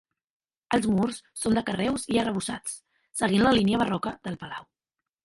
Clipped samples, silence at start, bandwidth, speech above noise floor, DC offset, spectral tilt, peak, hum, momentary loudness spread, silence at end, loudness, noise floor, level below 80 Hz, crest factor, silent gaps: under 0.1%; 0.7 s; 11.5 kHz; 62 dB; under 0.1%; -5 dB/octave; -8 dBFS; none; 15 LU; 0.6 s; -26 LUFS; -88 dBFS; -54 dBFS; 18 dB; none